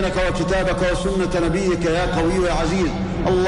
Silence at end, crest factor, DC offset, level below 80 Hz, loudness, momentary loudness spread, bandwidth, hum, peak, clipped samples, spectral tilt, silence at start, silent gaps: 0 s; 10 dB; under 0.1%; -28 dBFS; -20 LUFS; 2 LU; 11 kHz; none; -8 dBFS; under 0.1%; -6 dB/octave; 0 s; none